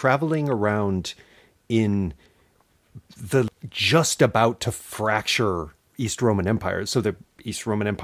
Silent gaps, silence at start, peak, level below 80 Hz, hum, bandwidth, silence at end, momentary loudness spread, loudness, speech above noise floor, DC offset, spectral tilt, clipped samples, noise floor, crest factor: none; 0 s; -4 dBFS; -46 dBFS; none; 16 kHz; 0 s; 12 LU; -23 LUFS; 39 dB; under 0.1%; -5 dB/octave; under 0.1%; -62 dBFS; 20 dB